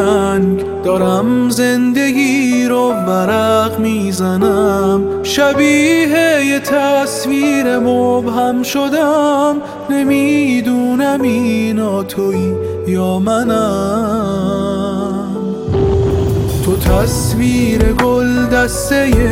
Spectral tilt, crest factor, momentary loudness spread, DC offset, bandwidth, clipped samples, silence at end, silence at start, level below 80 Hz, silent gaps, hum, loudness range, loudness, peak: -5.5 dB/octave; 12 dB; 5 LU; under 0.1%; 16.5 kHz; under 0.1%; 0 s; 0 s; -28 dBFS; none; none; 3 LU; -13 LUFS; 0 dBFS